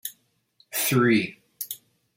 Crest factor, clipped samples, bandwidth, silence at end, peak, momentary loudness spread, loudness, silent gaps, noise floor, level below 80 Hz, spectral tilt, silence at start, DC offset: 18 dB; under 0.1%; 16.5 kHz; 0.4 s; -8 dBFS; 17 LU; -24 LUFS; none; -64 dBFS; -66 dBFS; -4.5 dB/octave; 0.05 s; under 0.1%